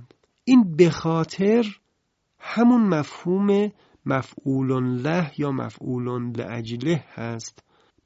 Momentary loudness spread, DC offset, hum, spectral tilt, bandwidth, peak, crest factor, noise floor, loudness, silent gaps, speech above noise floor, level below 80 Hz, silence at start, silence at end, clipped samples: 14 LU; under 0.1%; none; -7 dB/octave; 8 kHz; -2 dBFS; 20 dB; -73 dBFS; -23 LUFS; none; 51 dB; -60 dBFS; 0 s; 0.55 s; under 0.1%